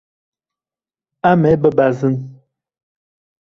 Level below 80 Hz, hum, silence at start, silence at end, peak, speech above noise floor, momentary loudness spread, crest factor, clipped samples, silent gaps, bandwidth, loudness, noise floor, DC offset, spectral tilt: -50 dBFS; none; 1.25 s; 1.25 s; -2 dBFS; over 77 dB; 11 LU; 18 dB; under 0.1%; none; 7.2 kHz; -15 LUFS; under -90 dBFS; under 0.1%; -9 dB/octave